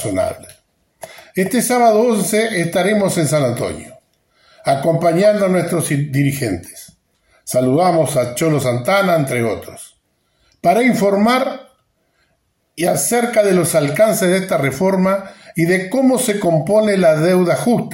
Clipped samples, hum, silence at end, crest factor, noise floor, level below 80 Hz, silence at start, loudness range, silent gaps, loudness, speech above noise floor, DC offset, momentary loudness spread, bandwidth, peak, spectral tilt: under 0.1%; none; 0 s; 14 dB; -65 dBFS; -54 dBFS; 0 s; 2 LU; none; -15 LUFS; 50 dB; under 0.1%; 10 LU; 16.5 kHz; -2 dBFS; -5.5 dB/octave